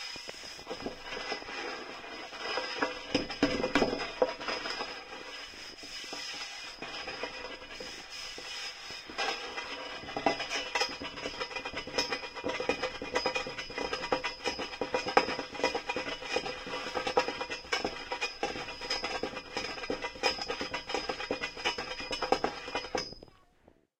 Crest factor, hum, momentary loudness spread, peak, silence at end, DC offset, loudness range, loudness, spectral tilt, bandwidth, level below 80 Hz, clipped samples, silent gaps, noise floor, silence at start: 28 dB; none; 10 LU; -8 dBFS; 0.7 s; under 0.1%; 6 LU; -35 LUFS; -2.5 dB/octave; 16 kHz; -56 dBFS; under 0.1%; none; -64 dBFS; 0 s